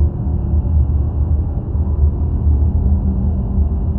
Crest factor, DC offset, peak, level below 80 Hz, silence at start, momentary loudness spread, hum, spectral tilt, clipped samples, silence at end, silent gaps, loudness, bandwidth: 12 dB; under 0.1%; -4 dBFS; -16 dBFS; 0 s; 4 LU; none; -14.5 dB/octave; under 0.1%; 0 s; none; -17 LUFS; 1.5 kHz